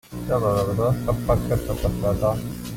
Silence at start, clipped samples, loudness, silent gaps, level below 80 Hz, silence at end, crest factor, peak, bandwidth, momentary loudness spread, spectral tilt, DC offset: 0.1 s; under 0.1%; -23 LUFS; none; -34 dBFS; 0 s; 16 dB; -8 dBFS; 16.5 kHz; 4 LU; -7.5 dB/octave; under 0.1%